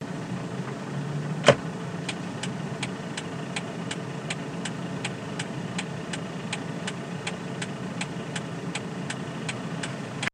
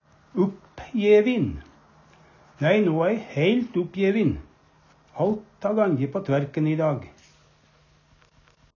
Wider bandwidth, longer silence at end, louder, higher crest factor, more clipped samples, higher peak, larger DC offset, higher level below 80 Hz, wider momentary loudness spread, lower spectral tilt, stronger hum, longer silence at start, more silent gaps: first, 11 kHz vs 7 kHz; second, 0.05 s vs 1.7 s; second, -31 LUFS vs -24 LUFS; first, 30 dB vs 18 dB; neither; first, 0 dBFS vs -6 dBFS; neither; second, -64 dBFS vs -52 dBFS; second, 3 LU vs 13 LU; second, -4.5 dB/octave vs -8 dB/octave; neither; second, 0 s vs 0.35 s; neither